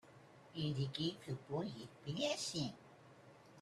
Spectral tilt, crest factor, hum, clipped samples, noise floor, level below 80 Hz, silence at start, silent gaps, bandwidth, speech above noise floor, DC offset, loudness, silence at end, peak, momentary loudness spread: -5 dB/octave; 18 dB; none; under 0.1%; -62 dBFS; -74 dBFS; 0.05 s; none; 13.5 kHz; 20 dB; under 0.1%; -43 LUFS; 0 s; -26 dBFS; 23 LU